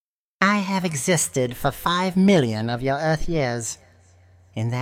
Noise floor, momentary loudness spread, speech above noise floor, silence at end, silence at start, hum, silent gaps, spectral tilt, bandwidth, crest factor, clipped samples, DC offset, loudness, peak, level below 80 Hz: -53 dBFS; 11 LU; 32 dB; 0 s; 0.4 s; none; none; -4.5 dB/octave; 16.5 kHz; 18 dB; under 0.1%; under 0.1%; -22 LUFS; -4 dBFS; -42 dBFS